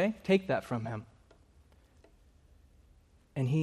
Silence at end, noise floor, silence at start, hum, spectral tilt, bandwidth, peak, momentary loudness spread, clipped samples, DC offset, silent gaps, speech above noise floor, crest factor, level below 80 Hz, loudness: 0 s; -63 dBFS; 0 s; none; -7.5 dB/octave; 13.5 kHz; -14 dBFS; 14 LU; under 0.1%; under 0.1%; none; 32 dB; 22 dB; -64 dBFS; -33 LUFS